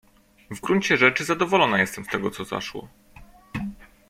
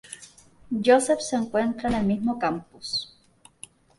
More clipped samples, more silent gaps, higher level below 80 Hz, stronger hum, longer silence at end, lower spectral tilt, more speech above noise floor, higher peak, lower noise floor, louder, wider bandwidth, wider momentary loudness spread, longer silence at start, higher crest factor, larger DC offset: neither; neither; about the same, -54 dBFS vs -54 dBFS; neither; second, 0.25 s vs 0.95 s; about the same, -4.5 dB/octave vs -4.5 dB/octave; second, 26 dB vs 33 dB; first, -2 dBFS vs -6 dBFS; second, -49 dBFS vs -57 dBFS; first, -22 LUFS vs -25 LUFS; first, 16 kHz vs 11.5 kHz; second, 18 LU vs 23 LU; first, 0.5 s vs 0.1 s; about the same, 22 dB vs 20 dB; neither